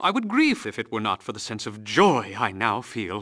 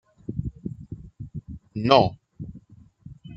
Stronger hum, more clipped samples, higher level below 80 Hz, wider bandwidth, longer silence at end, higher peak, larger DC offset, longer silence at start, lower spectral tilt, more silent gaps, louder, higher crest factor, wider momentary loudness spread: neither; neither; second, -66 dBFS vs -48 dBFS; first, 11 kHz vs 7.4 kHz; about the same, 0 s vs 0 s; second, -4 dBFS vs 0 dBFS; neither; second, 0 s vs 0.3 s; second, -4.5 dB/octave vs -7 dB/octave; neither; about the same, -24 LUFS vs -23 LUFS; second, 20 dB vs 26 dB; second, 12 LU vs 22 LU